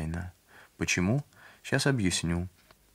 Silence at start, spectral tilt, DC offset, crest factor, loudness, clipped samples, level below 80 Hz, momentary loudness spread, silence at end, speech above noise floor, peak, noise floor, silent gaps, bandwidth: 0 s; -4.5 dB/octave; under 0.1%; 22 dB; -29 LUFS; under 0.1%; -50 dBFS; 18 LU; 0.45 s; 28 dB; -10 dBFS; -56 dBFS; none; 16 kHz